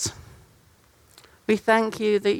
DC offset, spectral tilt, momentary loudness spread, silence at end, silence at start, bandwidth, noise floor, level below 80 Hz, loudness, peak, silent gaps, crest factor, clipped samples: under 0.1%; -4 dB/octave; 10 LU; 0 s; 0 s; 16.5 kHz; -58 dBFS; -58 dBFS; -23 LUFS; -6 dBFS; none; 20 dB; under 0.1%